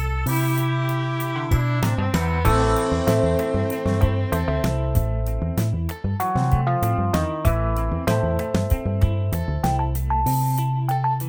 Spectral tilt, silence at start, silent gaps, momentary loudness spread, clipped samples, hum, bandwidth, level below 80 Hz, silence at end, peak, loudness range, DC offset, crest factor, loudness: -7 dB/octave; 0 s; none; 4 LU; under 0.1%; none; over 20 kHz; -28 dBFS; 0 s; -4 dBFS; 2 LU; under 0.1%; 16 dB; -22 LUFS